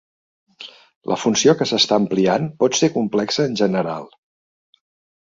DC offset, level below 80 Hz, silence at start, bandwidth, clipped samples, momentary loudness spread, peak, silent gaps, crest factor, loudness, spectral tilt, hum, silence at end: under 0.1%; -60 dBFS; 0.6 s; 7.8 kHz; under 0.1%; 20 LU; -2 dBFS; 0.96-1.01 s; 18 dB; -18 LUFS; -4 dB/octave; none; 1.25 s